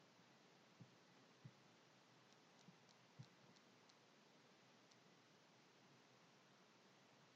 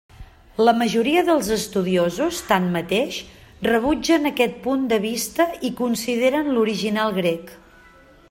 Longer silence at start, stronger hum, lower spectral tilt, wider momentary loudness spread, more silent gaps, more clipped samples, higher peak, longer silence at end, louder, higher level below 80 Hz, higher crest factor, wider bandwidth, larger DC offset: second, 0 s vs 0.2 s; neither; about the same, -3.5 dB/octave vs -4.5 dB/octave; second, 3 LU vs 6 LU; neither; neither; second, -48 dBFS vs -4 dBFS; second, 0 s vs 0.75 s; second, -68 LUFS vs -21 LUFS; second, under -90 dBFS vs -50 dBFS; about the same, 22 dB vs 18 dB; second, 7.6 kHz vs 16.5 kHz; neither